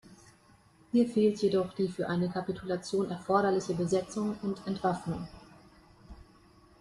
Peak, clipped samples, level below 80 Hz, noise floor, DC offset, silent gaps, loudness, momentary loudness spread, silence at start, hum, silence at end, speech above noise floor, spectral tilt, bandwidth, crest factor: -12 dBFS; under 0.1%; -62 dBFS; -61 dBFS; under 0.1%; none; -31 LUFS; 9 LU; 0.05 s; none; 0.6 s; 31 dB; -6.5 dB/octave; 11.5 kHz; 20 dB